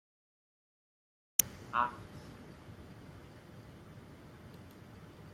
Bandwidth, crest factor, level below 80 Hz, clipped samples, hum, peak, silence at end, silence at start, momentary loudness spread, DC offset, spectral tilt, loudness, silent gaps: 16 kHz; 42 dB; -66 dBFS; under 0.1%; none; -2 dBFS; 0 s; 1.4 s; 23 LU; under 0.1%; -2 dB/octave; -33 LUFS; none